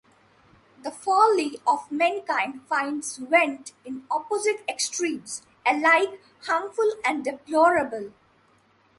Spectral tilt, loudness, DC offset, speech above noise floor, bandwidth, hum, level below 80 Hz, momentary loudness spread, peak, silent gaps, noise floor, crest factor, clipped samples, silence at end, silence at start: -2 dB/octave; -24 LUFS; under 0.1%; 37 dB; 11.5 kHz; none; -70 dBFS; 17 LU; -6 dBFS; none; -61 dBFS; 20 dB; under 0.1%; 0.9 s; 0.85 s